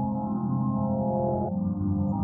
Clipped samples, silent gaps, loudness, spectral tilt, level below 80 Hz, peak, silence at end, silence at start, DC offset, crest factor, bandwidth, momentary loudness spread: under 0.1%; none; -28 LUFS; -16 dB/octave; -52 dBFS; -16 dBFS; 0 s; 0 s; under 0.1%; 12 dB; 1.6 kHz; 2 LU